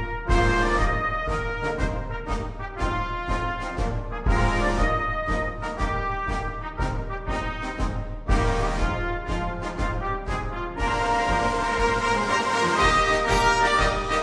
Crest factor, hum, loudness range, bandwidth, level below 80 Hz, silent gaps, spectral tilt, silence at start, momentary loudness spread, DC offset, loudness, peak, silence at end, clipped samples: 16 dB; none; 6 LU; 10.5 kHz; -30 dBFS; none; -5 dB/octave; 0 s; 10 LU; under 0.1%; -25 LUFS; -8 dBFS; 0 s; under 0.1%